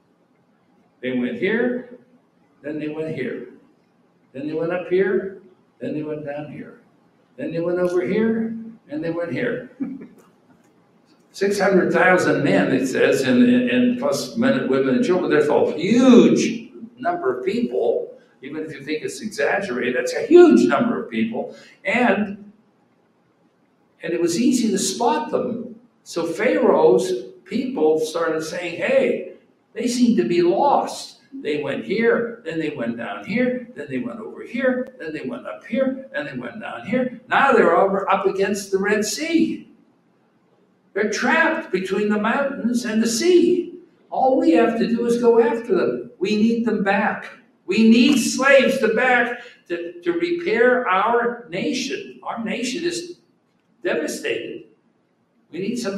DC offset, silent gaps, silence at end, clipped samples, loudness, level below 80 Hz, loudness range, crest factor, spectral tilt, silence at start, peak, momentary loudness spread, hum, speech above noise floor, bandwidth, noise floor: under 0.1%; none; 0 s; under 0.1%; -20 LUFS; -66 dBFS; 9 LU; 20 dB; -5 dB/octave; 1.05 s; 0 dBFS; 16 LU; none; 44 dB; 13.5 kHz; -64 dBFS